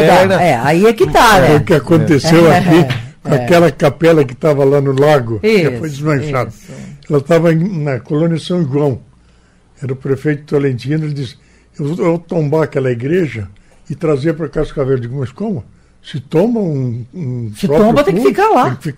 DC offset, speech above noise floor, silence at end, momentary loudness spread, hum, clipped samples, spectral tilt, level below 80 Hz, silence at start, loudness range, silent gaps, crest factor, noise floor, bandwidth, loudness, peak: under 0.1%; 36 dB; 0.05 s; 14 LU; none; under 0.1%; -6.5 dB/octave; -36 dBFS; 0 s; 8 LU; none; 12 dB; -48 dBFS; 16 kHz; -13 LUFS; 0 dBFS